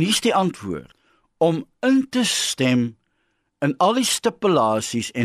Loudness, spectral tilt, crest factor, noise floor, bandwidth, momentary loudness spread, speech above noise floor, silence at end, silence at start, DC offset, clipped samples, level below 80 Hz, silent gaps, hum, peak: -20 LUFS; -4 dB/octave; 16 dB; -70 dBFS; 13 kHz; 8 LU; 50 dB; 0 s; 0 s; under 0.1%; under 0.1%; -60 dBFS; none; none; -6 dBFS